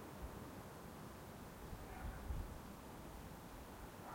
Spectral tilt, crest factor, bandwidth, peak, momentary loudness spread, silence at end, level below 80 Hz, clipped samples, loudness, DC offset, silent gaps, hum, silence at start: -5.5 dB/octave; 16 dB; 16.5 kHz; -34 dBFS; 5 LU; 0 s; -56 dBFS; under 0.1%; -53 LUFS; under 0.1%; none; none; 0 s